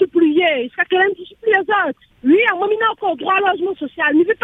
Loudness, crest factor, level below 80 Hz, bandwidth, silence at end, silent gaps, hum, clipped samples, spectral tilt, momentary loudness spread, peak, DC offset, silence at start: -16 LUFS; 14 dB; -60 dBFS; 3.9 kHz; 0.1 s; none; none; under 0.1%; -6 dB/octave; 8 LU; -2 dBFS; under 0.1%; 0 s